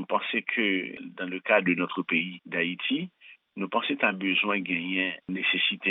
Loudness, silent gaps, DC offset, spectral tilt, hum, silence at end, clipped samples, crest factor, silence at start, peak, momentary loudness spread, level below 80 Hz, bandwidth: -27 LUFS; none; under 0.1%; -8 dB/octave; none; 0 s; under 0.1%; 20 dB; 0 s; -8 dBFS; 10 LU; -78 dBFS; 4.1 kHz